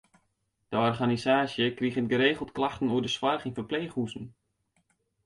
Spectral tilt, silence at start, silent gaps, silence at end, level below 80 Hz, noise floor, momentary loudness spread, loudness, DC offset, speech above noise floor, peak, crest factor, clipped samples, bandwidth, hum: -5.5 dB/octave; 0.7 s; none; 0.95 s; -62 dBFS; -76 dBFS; 9 LU; -28 LUFS; under 0.1%; 48 dB; -12 dBFS; 18 dB; under 0.1%; 11.5 kHz; none